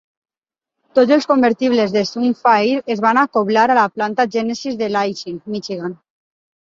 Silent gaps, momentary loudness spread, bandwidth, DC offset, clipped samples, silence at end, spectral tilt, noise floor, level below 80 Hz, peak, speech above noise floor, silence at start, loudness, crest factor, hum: none; 12 LU; 7.6 kHz; under 0.1%; under 0.1%; 0.8 s; -5 dB/octave; -88 dBFS; -64 dBFS; -2 dBFS; 72 dB; 0.95 s; -16 LUFS; 16 dB; none